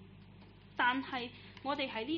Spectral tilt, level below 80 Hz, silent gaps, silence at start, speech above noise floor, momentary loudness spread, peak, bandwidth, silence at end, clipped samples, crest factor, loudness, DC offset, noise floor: -1 dB/octave; -66 dBFS; none; 0 s; 20 dB; 24 LU; -16 dBFS; 6.4 kHz; 0 s; under 0.1%; 22 dB; -36 LUFS; under 0.1%; -57 dBFS